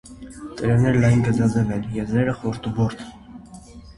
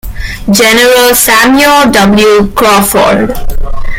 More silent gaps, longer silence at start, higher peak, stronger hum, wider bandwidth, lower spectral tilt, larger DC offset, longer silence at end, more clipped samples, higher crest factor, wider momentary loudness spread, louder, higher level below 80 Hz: neither; about the same, 0.05 s vs 0.05 s; second, -6 dBFS vs 0 dBFS; neither; second, 11.5 kHz vs over 20 kHz; first, -8 dB/octave vs -3 dB/octave; neither; about the same, 0.05 s vs 0 s; second, under 0.1% vs 0.9%; first, 16 dB vs 6 dB; first, 21 LU vs 14 LU; second, -21 LUFS vs -5 LUFS; second, -42 dBFS vs -18 dBFS